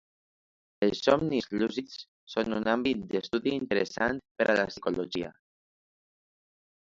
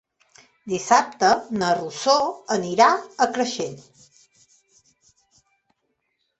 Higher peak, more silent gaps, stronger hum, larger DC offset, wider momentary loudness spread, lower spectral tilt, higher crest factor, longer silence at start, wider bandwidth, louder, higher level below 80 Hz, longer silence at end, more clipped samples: second, -8 dBFS vs -2 dBFS; first, 2.08-2.27 s, 4.31-4.35 s vs none; neither; neither; about the same, 10 LU vs 12 LU; first, -5.5 dB/octave vs -3 dB/octave; about the same, 22 dB vs 22 dB; first, 0.8 s vs 0.65 s; about the same, 7.8 kHz vs 8.4 kHz; second, -29 LUFS vs -21 LUFS; about the same, -62 dBFS vs -66 dBFS; second, 1.55 s vs 2.6 s; neither